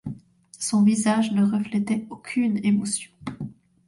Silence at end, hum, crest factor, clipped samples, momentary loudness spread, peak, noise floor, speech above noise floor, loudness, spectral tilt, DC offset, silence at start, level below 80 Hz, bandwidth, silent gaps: 0.35 s; none; 14 dB; under 0.1%; 18 LU; -10 dBFS; -46 dBFS; 23 dB; -23 LUFS; -5 dB/octave; under 0.1%; 0.05 s; -60 dBFS; 11.5 kHz; none